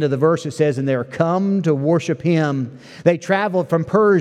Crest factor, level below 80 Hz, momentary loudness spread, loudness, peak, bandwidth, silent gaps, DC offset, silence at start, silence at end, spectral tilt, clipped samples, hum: 18 dB; -62 dBFS; 4 LU; -18 LUFS; 0 dBFS; 10 kHz; none; under 0.1%; 0 s; 0 s; -7.5 dB/octave; under 0.1%; none